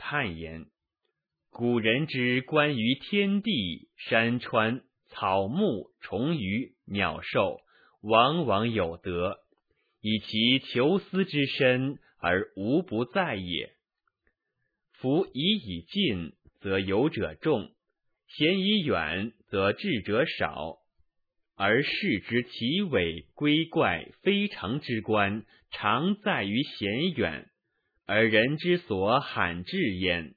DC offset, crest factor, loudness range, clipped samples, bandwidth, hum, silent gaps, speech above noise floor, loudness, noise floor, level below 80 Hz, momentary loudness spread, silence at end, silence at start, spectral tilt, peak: under 0.1%; 22 dB; 3 LU; under 0.1%; 4.9 kHz; none; none; 55 dB; -27 LUFS; -82 dBFS; -60 dBFS; 10 LU; 0.05 s; 0 s; -8.5 dB/octave; -6 dBFS